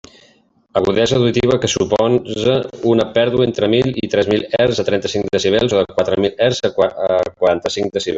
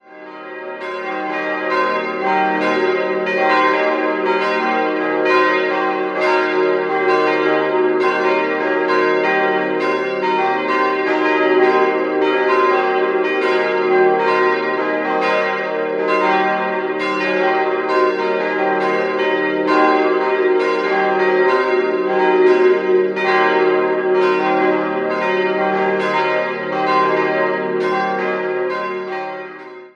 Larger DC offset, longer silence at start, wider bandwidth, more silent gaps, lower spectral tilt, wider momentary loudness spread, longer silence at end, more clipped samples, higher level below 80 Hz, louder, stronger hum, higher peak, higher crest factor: neither; first, 0.75 s vs 0.1 s; first, 8 kHz vs 7 kHz; neither; about the same, -5 dB/octave vs -5.5 dB/octave; about the same, 4 LU vs 6 LU; about the same, 0 s vs 0.05 s; neither; first, -46 dBFS vs -70 dBFS; about the same, -16 LUFS vs -16 LUFS; neither; about the same, 0 dBFS vs -2 dBFS; about the same, 16 dB vs 16 dB